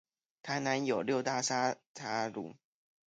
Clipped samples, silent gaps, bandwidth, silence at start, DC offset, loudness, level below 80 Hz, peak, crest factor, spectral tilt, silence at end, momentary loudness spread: under 0.1%; 1.86-1.95 s; 9.6 kHz; 0.45 s; under 0.1%; -34 LUFS; -80 dBFS; -18 dBFS; 18 dB; -3.5 dB/octave; 0.55 s; 12 LU